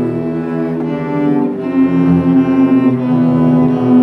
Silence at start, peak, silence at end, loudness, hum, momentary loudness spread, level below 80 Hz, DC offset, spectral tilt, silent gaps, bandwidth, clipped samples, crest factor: 0 s; 0 dBFS; 0 s; -13 LUFS; none; 7 LU; -46 dBFS; under 0.1%; -10 dB/octave; none; 4.3 kHz; under 0.1%; 12 dB